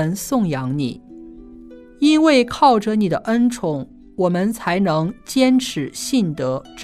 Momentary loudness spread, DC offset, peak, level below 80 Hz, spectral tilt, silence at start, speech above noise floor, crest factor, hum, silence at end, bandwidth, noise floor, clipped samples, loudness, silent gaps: 10 LU; under 0.1%; -2 dBFS; -50 dBFS; -5.5 dB/octave; 0 s; 23 dB; 16 dB; none; 0 s; 14 kHz; -40 dBFS; under 0.1%; -18 LUFS; none